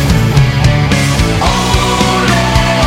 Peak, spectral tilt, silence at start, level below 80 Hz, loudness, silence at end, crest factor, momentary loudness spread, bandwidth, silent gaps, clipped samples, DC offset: 0 dBFS; -5 dB/octave; 0 s; -18 dBFS; -10 LUFS; 0 s; 10 dB; 2 LU; 16.5 kHz; none; 0.2%; under 0.1%